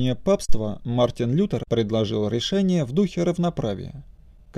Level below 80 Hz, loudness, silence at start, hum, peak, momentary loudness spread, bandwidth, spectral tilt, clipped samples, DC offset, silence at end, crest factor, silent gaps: -38 dBFS; -24 LUFS; 0 s; none; -6 dBFS; 8 LU; 12 kHz; -6.5 dB/octave; under 0.1%; under 0.1%; 0.45 s; 16 dB; none